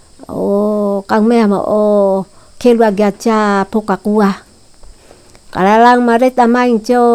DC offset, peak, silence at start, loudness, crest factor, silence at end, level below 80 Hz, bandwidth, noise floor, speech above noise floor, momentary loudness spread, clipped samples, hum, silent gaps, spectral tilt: under 0.1%; 0 dBFS; 0.2 s; -12 LUFS; 12 dB; 0 s; -46 dBFS; 13.5 kHz; -41 dBFS; 31 dB; 8 LU; under 0.1%; none; none; -6.5 dB/octave